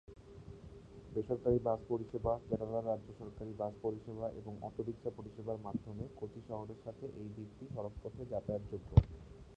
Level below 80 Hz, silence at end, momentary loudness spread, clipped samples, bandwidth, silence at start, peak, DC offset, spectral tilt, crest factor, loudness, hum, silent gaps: -50 dBFS; 0 s; 17 LU; under 0.1%; 8.2 kHz; 0.1 s; -12 dBFS; under 0.1%; -10.5 dB/octave; 28 dB; -40 LUFS; none; none